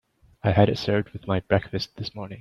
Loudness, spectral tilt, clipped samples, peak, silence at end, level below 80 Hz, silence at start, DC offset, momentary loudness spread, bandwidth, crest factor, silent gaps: -25 LUFS; -7.5 dB/octave; under 0.1%; -4 dBFS; 0 s; -52 dBFS; 0.45 s; under 0.1%; 12 LU; 7 kHz; 20 dB; none